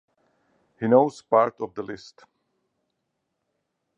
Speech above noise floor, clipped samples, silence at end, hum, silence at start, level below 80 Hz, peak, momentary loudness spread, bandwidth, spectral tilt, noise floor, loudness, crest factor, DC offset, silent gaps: 56 dB; under 0.1%; 2 s; none; 0.8 s; -72 dBFS; -4 dBFS; 17 LU; 9.2 kHz; -7.5 dB/octave; -79 dBFS; -22 LUFS; 24 dB; under 0.1%; none